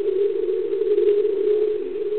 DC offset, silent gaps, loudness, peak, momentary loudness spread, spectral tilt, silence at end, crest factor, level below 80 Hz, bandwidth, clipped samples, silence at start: 1%; none; -21 LUFS; -8 dBFS; 5 LU; -10 dB/octave; 0 s; 12 dB; -62 dBFS; 4.2 kHz; under 0.1%; 0 s